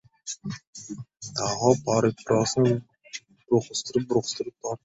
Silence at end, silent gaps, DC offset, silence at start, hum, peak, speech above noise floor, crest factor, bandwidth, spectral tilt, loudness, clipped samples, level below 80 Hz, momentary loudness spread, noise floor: 0.1 s; 0.67-0.73 s; under 0.1%; 0.25 s; none; -4 dBFS; 19 dB; 22 dB; 8.4 kHz; -5 dB/octave; -25 LUFS; under 0.1%; -62 dBFS; 18 LU; -44 dBFS